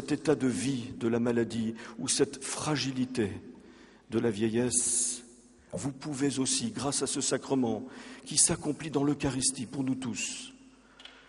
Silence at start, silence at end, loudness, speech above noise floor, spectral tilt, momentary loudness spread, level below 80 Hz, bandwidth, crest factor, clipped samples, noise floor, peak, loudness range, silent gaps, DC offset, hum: 0 s; 0.1 s; -30 LUFS; 25 dB; -3.5 dB/octave; 11 LU; -60 dBFS; 11.5 kHz; 20 dB; under 0.1%; -56 dBFS; -10 dBFS; 3 LU; none; under 0.1%; none